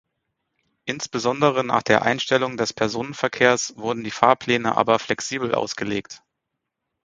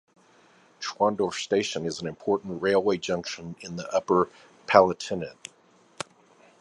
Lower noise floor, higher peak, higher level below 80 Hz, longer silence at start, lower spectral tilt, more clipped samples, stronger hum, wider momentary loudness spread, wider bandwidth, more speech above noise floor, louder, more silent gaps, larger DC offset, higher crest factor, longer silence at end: first, -81 dBFS vs -60 dBFS; about the same, 0 dBFS vs -2 dBFS; about the same, -60 dBFS vs -62 dBFS; about the same, 0.85 s vs 0.8 s; about the same, -4 dB/octave vs -4.5 dB/octave; neither; neither; second, 9 LU vs 19 LU; second, 9.4 kHz vs 11.5 kHz; first, 59 dB vs 34 dB; first, -21 LUFS vs -26 LUFS; neither; neither; about the same, 22 dB vs 24 dB; second, 0.85 s vs 1.3 s